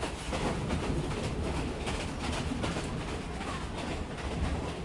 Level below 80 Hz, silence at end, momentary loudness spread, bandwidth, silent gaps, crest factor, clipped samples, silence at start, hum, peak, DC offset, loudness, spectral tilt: -40 dBFS; 0 s; 4 LU; 11.5 kHz; none; 14 dB; under 0.1%; 0 s; none; -18 dBFS; under 0.1%; -35 LUFS; -5.5 dB/octave